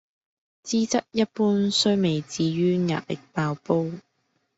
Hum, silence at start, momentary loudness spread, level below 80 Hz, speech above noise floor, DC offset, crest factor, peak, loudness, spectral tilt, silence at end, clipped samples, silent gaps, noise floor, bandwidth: none; 0.65 s; 10 LU; -64 dBFS; 49 dB; under 0.1%; 18 dB; -8 dBFS; -24 LUFS; -5 dB/octave; 0.6 s; under 0.1%; none; -72 dBFS; 8 kHz